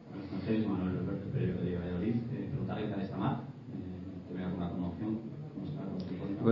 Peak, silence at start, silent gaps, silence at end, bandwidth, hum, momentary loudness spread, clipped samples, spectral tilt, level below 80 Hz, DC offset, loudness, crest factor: -12 dBFS; 0 s; none; 0 s; 5.8 kHz; none; 9 LU; under 0.1%; -8 dB/octave; -54 dBFS; under 0.1%; -37 LUFS; 22 dB